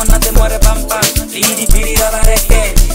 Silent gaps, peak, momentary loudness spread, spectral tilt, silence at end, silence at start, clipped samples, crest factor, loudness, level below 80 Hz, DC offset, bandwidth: none; 0 dBFS; 2 LU; -3 dB/octave; 0 s; 0 s; 0.3%; 10 dB; -12 LUFS; -10 dBFS; under 0.1%; 16.5 kHz